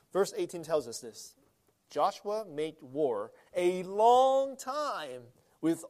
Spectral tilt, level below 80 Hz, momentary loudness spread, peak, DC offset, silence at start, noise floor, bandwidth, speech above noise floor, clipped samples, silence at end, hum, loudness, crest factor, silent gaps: -4.5 dB/octave; -80 dBFS; 18 LU; -12 dBFS; under 0.1%; 0.15 s; -70 dBFS; 15 kHz; 39 dB; under 0.1%; 0 s; none; -31 LUFS; 18 dB; none